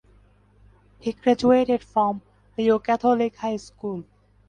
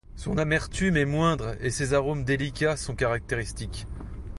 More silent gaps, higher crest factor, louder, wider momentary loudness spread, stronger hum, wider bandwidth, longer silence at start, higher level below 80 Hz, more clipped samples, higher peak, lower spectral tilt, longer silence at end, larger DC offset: neither; about the same, 18 dB vs 18 dB; first, -23 LUFS vs -27 LUFS; about the same, 14 LU vs 12 LU; neither; second, 9.8 kHz vs 11.5 kHz; first, 1.05 s vs 0.1 s; second, -56 dBFS vs -40 dBFS; neither; first, -6 dBFS vs -10 dBFS; about the same, -6.5 dB/octave vs -5.5 dB/octave; first, 0.45 s vs 0 s; neither